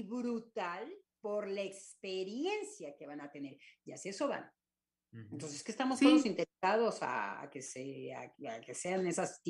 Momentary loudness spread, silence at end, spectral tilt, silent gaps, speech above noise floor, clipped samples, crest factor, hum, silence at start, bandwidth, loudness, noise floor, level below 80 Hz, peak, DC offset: 18 LU; 0 s; -4 dB/octave; none; over 53 dB; under 0.1%; 24 dB; none; 0 s; 11.5 kHz; -37 LUFS; under -90 dBFS; -86 dBFS; -14 dBFS; under 0.1%